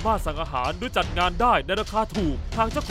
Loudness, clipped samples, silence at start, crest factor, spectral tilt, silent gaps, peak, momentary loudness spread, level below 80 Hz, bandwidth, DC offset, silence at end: -24 LUFS; under 0.1%; 0 s; 16 dB; -5 dB/octave; none; -8 dBFS; 6 LU; -32 dBFS; 16 kHz; under 0.1%; 0 s